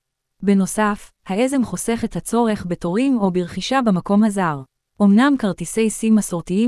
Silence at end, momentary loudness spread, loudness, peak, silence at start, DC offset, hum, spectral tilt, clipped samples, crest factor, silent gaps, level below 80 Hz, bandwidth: 0 s; 8 LU; -19 LUFS; -4 dBFS; 0.4 s; under 0.1%; none; -5.5 dB/octave; under 0.1%; 16 dB; none; -48 dBFS; 12 kHz